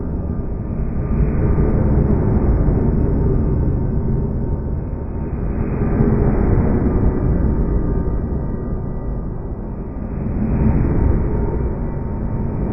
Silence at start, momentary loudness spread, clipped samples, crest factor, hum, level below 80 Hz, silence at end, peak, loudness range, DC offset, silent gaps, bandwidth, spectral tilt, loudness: 0 s; 9 LU; under 0.1%; 16 dB; none; -20 dBFS; 0 s; -2 dBFS; 4 LU; under 0.1%; none; 2.7 kHz; -13.5 dB/octave; -20 LUFS